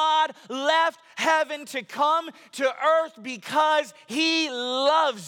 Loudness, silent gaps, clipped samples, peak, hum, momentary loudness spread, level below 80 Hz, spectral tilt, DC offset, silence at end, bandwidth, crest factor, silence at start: -24 LUFS; none; under 0.1%; -10 dBFS; none; 10 LU; -82 dBFS; -2 dB/octave; under 0.1%; 0 s; 18 kHz; 14 dB; 0 s